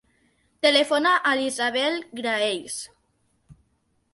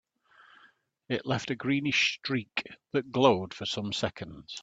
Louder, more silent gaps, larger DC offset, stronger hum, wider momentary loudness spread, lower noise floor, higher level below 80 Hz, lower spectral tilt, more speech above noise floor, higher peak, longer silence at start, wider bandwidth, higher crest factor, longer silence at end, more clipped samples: first, -22 LUFS vs -29 LUFS; neither; neither; neither; about the same, 13 LU vs 11 LU; first, -69 dBFS vs -63 dBFS; about the same, -68 dBFS vs -66 dBFS; second, -1.5 dB/octave vs -4.5 dB/octave; first, 46 dB vs 33 dB; about the same, -4 dBFS vs -6 dBFS; second, 0.65 s vs 1.1 s; first, 11.5 kHz vs 8 kHz; about the same, 20 dB vs 24 dB; first, 0.6 s vs 0 s; neither